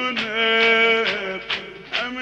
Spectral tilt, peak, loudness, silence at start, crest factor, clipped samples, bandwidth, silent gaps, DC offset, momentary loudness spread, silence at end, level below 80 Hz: -3 dB/octave; -6 dBFS; -19 LUFS; 0 s; 14 dB; under 0.1%; 8.4 kHz; none; under 0.1%; 12 LU; 0 s; -58 dBFS